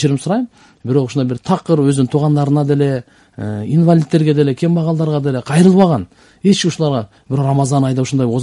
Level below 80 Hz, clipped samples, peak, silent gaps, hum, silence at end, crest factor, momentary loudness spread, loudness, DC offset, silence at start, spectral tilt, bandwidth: -52 dBFS; under 0.1%; 0 dBFS; none; none; 0 s; 14 dB; 10 LU; -15 LUFS; under 0.1%; 0 s; -7 dB/octave; 11.5 kHz